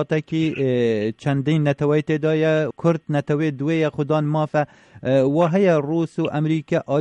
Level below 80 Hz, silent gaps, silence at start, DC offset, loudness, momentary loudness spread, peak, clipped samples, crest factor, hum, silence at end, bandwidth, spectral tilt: -60 dBFS; none; 0 s; under 0.1%; -21 LUFS; 5 LU; -6 dBFS; under 0.1%; 14 dB; none; 0 s; 8.8 kHz; -8 dB/octave